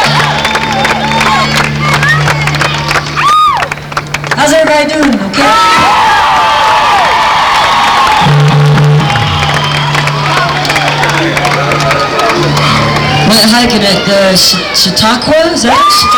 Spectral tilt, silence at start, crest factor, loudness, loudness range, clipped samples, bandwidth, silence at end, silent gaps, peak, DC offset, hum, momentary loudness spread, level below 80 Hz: -4 dB/octave; 0 s; 6 dB; -7 LUFS; 3 LU; under 0.1%; over 20 kHz; 0 s; none; -2 dBFS; under 0.1%; none; 4 LU; -32 dBFS